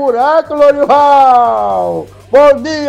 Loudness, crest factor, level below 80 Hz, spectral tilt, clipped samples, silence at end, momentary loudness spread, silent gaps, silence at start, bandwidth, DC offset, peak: -9 LUFS; 8 dB; -44 dBFS; -5 dB/octave; under 0.1%; 0 s; 9 LU; none; 0 s; 10 kHz; under 0.1%; 0 dBFS